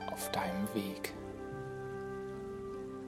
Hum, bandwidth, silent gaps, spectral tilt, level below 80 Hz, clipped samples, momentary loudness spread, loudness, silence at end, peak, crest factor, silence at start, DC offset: none; 16 kHz; none; -5 dB/octave; -60 dBFS; under 0.1%; 8 LU; -40 LUFS; 0 s; -18 dBFS; 22 dB; 0 s; under 0.1%